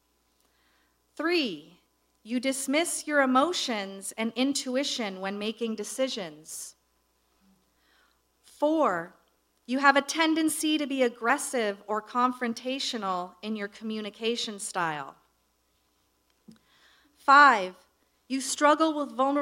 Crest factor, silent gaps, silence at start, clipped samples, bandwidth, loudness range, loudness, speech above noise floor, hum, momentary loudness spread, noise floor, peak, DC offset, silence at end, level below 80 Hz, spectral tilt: 24 dB; none; 1.2 s; under 0.1%; 16 kHz; 9 LU; -27 LUFS; 44 dB; none; 13 LU; -71 dBFS; -4 dBFS; under 0.1%; 0 s; -78 dBFS; -2.5 dB/octave